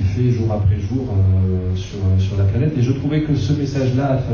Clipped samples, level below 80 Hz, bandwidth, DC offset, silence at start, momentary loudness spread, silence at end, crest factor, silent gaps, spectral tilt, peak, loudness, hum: under 0.1%; -28 dBFS; 7 kHz; under 0.1%; 0 s; 4 LU; 0 s; 12 dB; none; -8.5 dB/octave; -6 dBFS; -18 LUFS; none